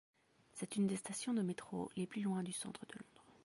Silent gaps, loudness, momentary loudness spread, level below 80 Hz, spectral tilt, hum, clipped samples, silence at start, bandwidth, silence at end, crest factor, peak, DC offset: none; -42 LUFS; 16 LU; -80 dBFS; -5 dB/octave; none; under 0.1%; 0.55 s; 11.5 kHz; 0.15 s; 16 dB; -28 dBFS; under 0.1%